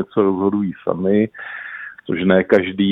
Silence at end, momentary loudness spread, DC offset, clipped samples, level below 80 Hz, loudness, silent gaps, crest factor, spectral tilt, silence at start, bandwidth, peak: 0 s; 15 LU; under 0.1%; under 0.1%; -56 dBFS; -18 LUFS; none; 18 dB; -9 dB/octave; 0 s; 5.4 kHz; 0 dBFS